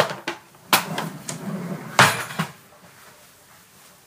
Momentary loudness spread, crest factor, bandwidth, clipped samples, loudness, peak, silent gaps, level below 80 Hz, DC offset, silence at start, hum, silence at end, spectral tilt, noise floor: 16 LU; 24 dB; 15.5 kHz; under 0.1%; -22 LUFS; 0 dBFS; none; -64 dBFS; under 0.1%; 0 s; none; 0.95 s; -3 dB/octave; -51 dBFS